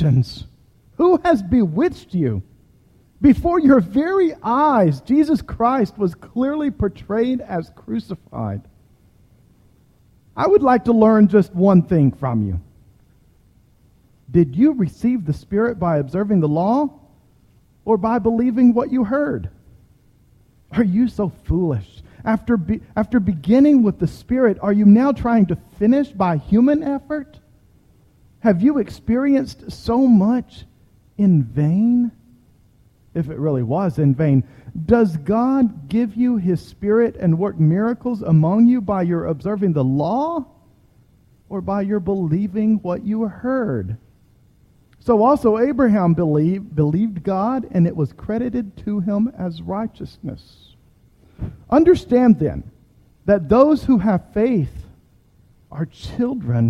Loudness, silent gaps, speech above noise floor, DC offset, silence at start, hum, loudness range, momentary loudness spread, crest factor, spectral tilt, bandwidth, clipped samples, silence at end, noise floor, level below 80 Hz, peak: -18 LUFS; none; 37 dB; under 0.1%; 0 s; none; 6 LU; 14 LU; 18 dB; -9.5 dB/octave; 11 kHz; under 0.1%; 0 s; -54 dBFS; -42 dBFS; 0 dBFS